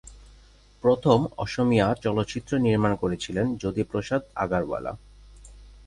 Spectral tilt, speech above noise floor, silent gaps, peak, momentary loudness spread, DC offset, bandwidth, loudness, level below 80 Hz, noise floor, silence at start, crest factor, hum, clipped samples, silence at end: -7 dB/octave; 29 dB; none; -6 dBFS; 8 LU; under 0.1%; 11 kHz; -25 LUFS; -48 dBFS; -53 dBFS; 0.05 s; 20 dB; 50 Hz at -50 dBFS; under 0.1%; 0.15 s